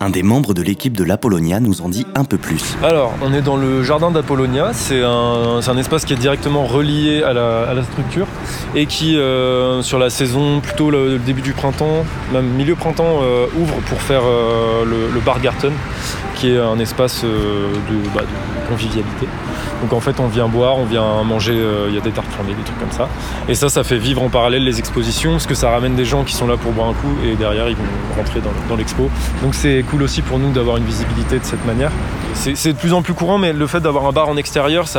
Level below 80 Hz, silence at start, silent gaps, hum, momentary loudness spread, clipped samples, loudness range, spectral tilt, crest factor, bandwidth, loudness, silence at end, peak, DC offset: -28 dBFS; 0 s; none; none; 6 LU; under 0.1%; 2 LU; -5.5 dB/octave; 14 dB; 19 kHz; -16 LUFS; 0 s; -2 dBFS; under 0.1%